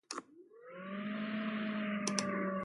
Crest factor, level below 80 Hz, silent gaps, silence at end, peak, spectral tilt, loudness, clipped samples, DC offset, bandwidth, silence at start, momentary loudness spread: 24 dB; -80 dBFS; none; 0 s; -16 dBFS; -4 dB/octave; -38 LUFS; under 0.1%; under 0.1%; 11.5 kHz; 0.1 s; 14 LU